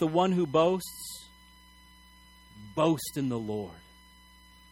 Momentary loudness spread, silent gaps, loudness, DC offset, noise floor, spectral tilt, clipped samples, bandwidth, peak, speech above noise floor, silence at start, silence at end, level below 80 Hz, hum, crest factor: 17 LU; none; -29 LUFS; under 0.1%; -56 dBFS; -6 dB/octave; under 0.1%; 17.5 kHz; -12 dBFS; 28 dB; 0 s; 0.9 s; -60 dBFS; none; 20 dB